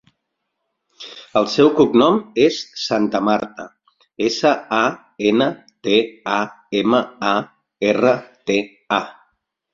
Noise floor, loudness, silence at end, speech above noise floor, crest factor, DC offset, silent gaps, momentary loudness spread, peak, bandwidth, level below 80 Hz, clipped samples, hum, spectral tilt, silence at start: -76 dBFS; -18 LUFS; 0.6 s; 58 dB; 18 dB; under 0.1%; none; 13 LU; -2 dBFS; 7.6 kHz; -58 dBFS; under 0.1%; none; -5 dB/octave; 1 s